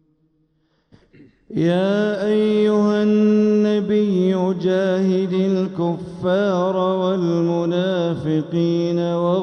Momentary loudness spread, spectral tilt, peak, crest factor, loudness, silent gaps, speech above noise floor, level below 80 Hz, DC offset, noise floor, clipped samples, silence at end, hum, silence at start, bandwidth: 5 LU; -8 dB/octave; -6 dBFS; 12 dB; -19 LUFS; none; 47 dB; -60 dBFS; under 0.1%; -64 dBFS; under 0.1%; 0 s; none; 1.5 s; 6.8 kHz